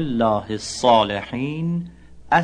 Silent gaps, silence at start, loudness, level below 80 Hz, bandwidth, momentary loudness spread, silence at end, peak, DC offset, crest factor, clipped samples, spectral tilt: none; 0 s; -21 LUFS; -48 dBFS; 10.5 kHz; 11 LU; 0 s; -4 dBFS; under 0.1%; 18 dB; under 0.1%; -5 dB/octave